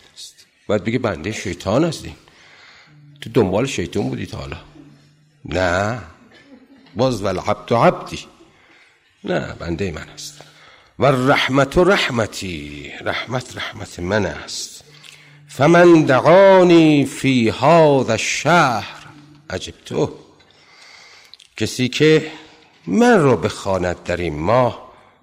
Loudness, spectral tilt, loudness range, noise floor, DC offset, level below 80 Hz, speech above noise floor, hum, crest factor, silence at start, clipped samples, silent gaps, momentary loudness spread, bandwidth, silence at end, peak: -17 LUFS; -5.5 dB/octave; 11 LU; -53 dBFS; under 0.1%; -46 dBFS; 37 dB; none; 14 dB; 0.2 s; under 0.1%; none; 20 LU; 15.5 kHz; 0.35 s; -4 dBFS